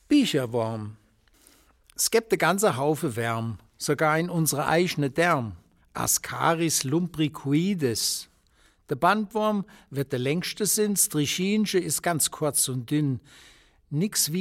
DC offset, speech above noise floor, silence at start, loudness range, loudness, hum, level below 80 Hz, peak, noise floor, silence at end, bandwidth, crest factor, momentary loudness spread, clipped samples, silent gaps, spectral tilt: under 0.1%; 37 dB; 0.1 s; 2 LU; -25 LUFS; none; -60 dBFS; -6 dBFS; -62 dBFS; 0 s; 17 kHz; 20 dB; 10 LU; under 0.1%; none; -4 dB/octave